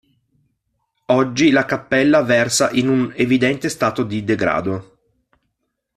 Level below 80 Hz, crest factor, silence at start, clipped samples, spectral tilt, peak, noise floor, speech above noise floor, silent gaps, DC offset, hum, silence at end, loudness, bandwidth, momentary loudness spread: -54 dBFS; 16 dB; 1.1 s; under 0.1%; -4.5 dB/octave; -2 dBFS; -74 dBFS; 57 dB; none; under 0.1%; none; 1.15 s; -17 LUFS; 14 kHz; 6 LU